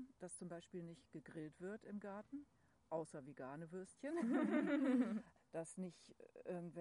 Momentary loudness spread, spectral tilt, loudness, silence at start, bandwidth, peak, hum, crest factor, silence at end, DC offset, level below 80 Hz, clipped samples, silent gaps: 17 LU; -6.5 dB/octave; -46 LUFS; 0 s; 10.5 kHz; -28 dBFS; none; 18 dB; 0 s; under 0.1%; -84 dBFS; under 0.1%; none